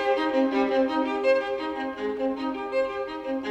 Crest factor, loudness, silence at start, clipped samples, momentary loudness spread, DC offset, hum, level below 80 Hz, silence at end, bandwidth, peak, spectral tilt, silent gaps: 14 dB; -26 LUFS; 0 s; under 0.1%; 7 LU; under 0.1%; none; -60 dBFS; 0 s; 8.4 kHz; -12 dBFS; -5 dB/octave; none